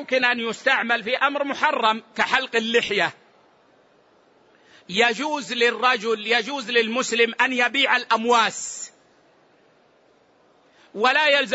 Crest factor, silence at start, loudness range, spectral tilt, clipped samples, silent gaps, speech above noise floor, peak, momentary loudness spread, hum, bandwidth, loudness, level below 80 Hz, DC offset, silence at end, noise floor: 18 dB; 0 s; 5 LU; -2 dB/octave; under 0.1%; none; 37 dB; -4 dBFS; 8 LU; none; 8 kHz; -21 LUFS; -70 dBFS; under 0.1%; 0 s; -58 dBFS